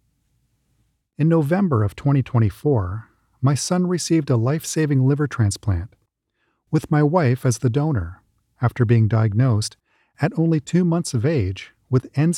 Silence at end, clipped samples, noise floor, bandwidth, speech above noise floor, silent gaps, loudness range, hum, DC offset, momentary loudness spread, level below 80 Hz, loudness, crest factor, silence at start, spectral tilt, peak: 0 s; under 0.1%; -71 dBFS; 14.5 kHz; 52 dB; none; 2 LU; none; under 0.1%; 8 LU; -48 dBFS; -20 LUFS; 16 dB; 1.2 s; -6.5 dB/octave; -4 dBFS